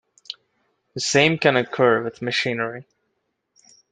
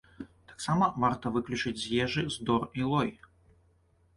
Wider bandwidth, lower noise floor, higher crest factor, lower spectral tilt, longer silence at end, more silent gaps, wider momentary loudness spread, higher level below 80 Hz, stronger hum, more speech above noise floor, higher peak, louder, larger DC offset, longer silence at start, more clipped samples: second, 9.4 kHz vs 11.5 kHz; first, -74 dBFS vs -66 dBFS; about the same, 20 dB vs 18 dB; second, -4 dB/octave vs -5.5 dB/octave; about the same, 1.1 s vs 1.05 s; neither; first, 20 LU vs 12 LU; second, -66 dBFS vs -58 dBFS; neither; first, 54 dB vs 37 dB; first, -2 dBFS vs -14 dBFS; first, -20 LUFS vs -30 LUFS; neither; about the same, 0.3 s vs 0.2 s; neither